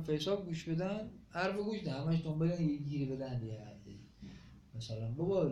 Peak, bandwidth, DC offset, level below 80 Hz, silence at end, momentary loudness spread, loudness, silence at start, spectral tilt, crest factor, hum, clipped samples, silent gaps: -22 dBFS; 8.8 kHz; under 0.1%; -62 dBFS; 0 s; 19 LU; -38 LUFS; 0 s; -7 dB/octave; 16 dB; none; under 0.1%; none